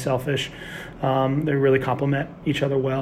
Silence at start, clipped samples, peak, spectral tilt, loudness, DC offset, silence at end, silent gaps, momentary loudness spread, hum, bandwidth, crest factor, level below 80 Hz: 0 s; under 0.1%; -8 dBFS; -6.5 dB/octave; -23 LUFS; under 0.1%; 0 s; none; 9 LU; none; 15 kHz; 14 dB; -50 dBFS